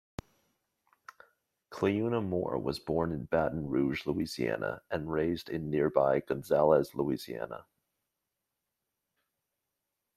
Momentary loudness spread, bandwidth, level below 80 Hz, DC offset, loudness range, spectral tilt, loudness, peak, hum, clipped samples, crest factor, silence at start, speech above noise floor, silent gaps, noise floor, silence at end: 12 LU; 15 kHz; -60 dBFS; under 0.1%; 5 LU; -7 dB/octave; -31 LUFS; -10 dBFS; none; under 0.1%; 22 dB; 1.7 s; 55 dB; none; -86 dBFS; 2.55 s